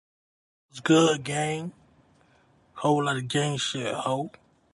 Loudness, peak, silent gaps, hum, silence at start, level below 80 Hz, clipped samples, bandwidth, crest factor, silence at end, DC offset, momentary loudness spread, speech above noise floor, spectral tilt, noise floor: -26 LUFS; -10 dBFS; none; none; 0.75 s; -66 dBFS; under 0.1%; 11.5 kHz; 18 dB; 0.45 s; under 0.1%; 14 LU; 36 dB; -4.5 dB/octave; -62 dBFS